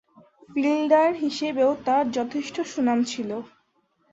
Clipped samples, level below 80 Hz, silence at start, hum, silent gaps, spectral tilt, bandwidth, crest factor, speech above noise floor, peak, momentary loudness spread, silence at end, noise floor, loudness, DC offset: under 0.1%; -68 dBFS; 0.5 s; none; none; -4.5 dB/octave; 8 kHz; 18 dB; 45 dB; -6 dBFS; 11 LU; 0.65 s; -68 dBFS; -24 LUFS; under 0.1%